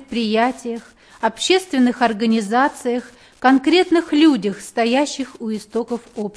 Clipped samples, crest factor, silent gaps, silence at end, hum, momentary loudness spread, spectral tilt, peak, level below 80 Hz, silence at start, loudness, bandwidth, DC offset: under 0.1%; 16 dB; none; 0.05 s; none; 12 LU; -4 dB/octave; -2 dBFS; -58 dBFS; 0 s; -18 LUFS; 11 kHz; under 0.1%